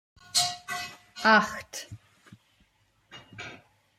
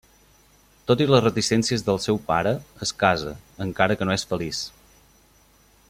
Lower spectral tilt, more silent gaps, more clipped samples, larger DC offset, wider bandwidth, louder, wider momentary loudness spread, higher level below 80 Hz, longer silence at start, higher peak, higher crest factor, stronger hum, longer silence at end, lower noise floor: second, -1.5 dB/octave vs -4.5 dB/octave; neither; neither; neither; about the same, 16 kHz vs 16 kHz; second, -26 LUFS vs -23 LUFS; first, 22 LU vs 13 LU; second, -68 dBFS vs -52 dBFS; second, 0.35 s vs 0.9 s; second, -8 dBFS vs -2 dBFS; about the same, 24 dB vs 22 dB; neither; second, 0.45 s vs 1.2 s; first, -67 dBFS vs -57 dBFS